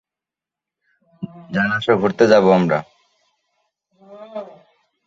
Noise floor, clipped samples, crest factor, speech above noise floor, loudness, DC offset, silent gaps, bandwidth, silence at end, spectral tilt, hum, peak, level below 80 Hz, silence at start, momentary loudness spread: -88 dBFS; under 0.1%; 18 dB; 73 dB; -16 LUFS; under 0.1%; none; 7.6 kHz; 0.6 s; -6.5 dB/octave; none; -2 dBFS; -60 dBFS; 1.2 s; 22 LU